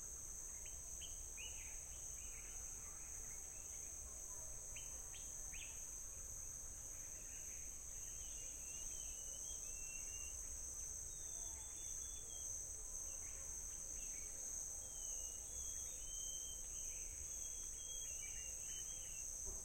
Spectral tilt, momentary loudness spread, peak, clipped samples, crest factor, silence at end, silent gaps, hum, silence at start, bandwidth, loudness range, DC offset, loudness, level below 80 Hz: -0.5 dB/octave; 4 LU; -34 dBFS; under 0.1%; 16 dB; 0 s; none; none; 0 s; 16.5 kHz; 3 LU; under 0.1%; -47 LUFS; -60 dBFS